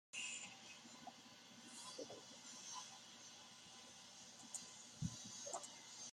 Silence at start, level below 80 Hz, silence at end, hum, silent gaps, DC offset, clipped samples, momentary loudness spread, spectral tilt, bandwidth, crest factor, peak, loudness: 0.15 s; -78 dBFS; 0 s; none; none; under 0.1%; under 0.1%; 9 LU; -2 dB/octave; 16 kHz; 22 dB; -32 dBFS; -53 LUFS